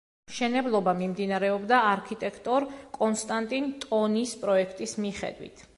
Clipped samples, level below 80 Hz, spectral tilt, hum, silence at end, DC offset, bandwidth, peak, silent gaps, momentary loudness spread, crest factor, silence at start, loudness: under 0.1%; -64 dBFS; -4.5 dB/octave; none; 0.15 s; under 0.1%; 11.5 kHz; -10 dBFS; none; 11 LU; 18 dB; 0.3 s; -28 LUFS